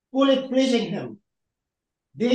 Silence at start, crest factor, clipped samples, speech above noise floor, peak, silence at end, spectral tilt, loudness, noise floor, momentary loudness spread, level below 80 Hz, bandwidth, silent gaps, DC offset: 0.15 s; 16 dB; under 0.1%; 63 dB; -8 dBFS; 0 s; -5 dB/octave; -22 LUFS; -85 dBFS; 12 LU; -74 dBFS; 9.4 kHz; none; under 0.1%